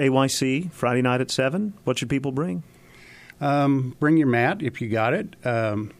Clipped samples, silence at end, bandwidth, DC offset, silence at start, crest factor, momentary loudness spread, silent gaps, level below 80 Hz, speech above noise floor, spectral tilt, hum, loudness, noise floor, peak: under 0.1%; 0.1 s; 15.5 kHz; under 0.1%; 0 s; 16 dB; 7 LU; none; -60 dBFS; 25 dB; -5.5 dB/octave; none; -23 LUFS; -48 dBFS; -6 dBFS